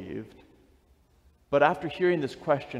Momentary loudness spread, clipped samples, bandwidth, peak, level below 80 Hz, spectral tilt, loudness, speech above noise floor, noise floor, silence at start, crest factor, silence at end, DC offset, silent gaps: 17 LU; under 0.1%; 10.5 kHz; -8 dBFS; -62 dBFS; -7 dB/octave; -26 LUFS; 36 dB; -63 dBFS; 0 s; 20 dB; 0 s; under 0.1%; none